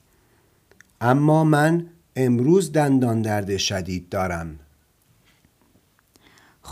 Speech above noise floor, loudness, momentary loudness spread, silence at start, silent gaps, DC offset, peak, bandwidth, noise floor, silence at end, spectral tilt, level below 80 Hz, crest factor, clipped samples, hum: 41 dB; -21 LUFS; 11 LU; 1 s; none; under 0.1%; -4 dBFS; 15.5 kHz; -61 dBFS; 0 s; -6 dB/octave; -54 dBFS; 20 dB; under 0.1%; none